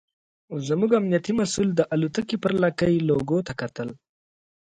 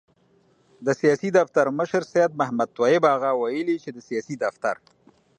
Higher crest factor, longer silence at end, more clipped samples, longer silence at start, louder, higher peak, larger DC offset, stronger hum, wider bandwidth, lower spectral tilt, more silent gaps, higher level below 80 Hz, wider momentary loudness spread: about the same, 18 dB vs 18 dB; first, 0.85 s vs 0.65 s; neither; second, 0.5 s vs 0.8 s; about the same, -24 LUFS vs -23 LUFS; second, -8 dBFS vs -4 dBFS; neither; neither; about the same, 9.4 kHz vs 9.4 kHz; about the same, -6 dB/octave vs -6 dB/octave; neither; first, -56 dBFS vs -72 dBFS; about the same, 11 LU vs 11 LU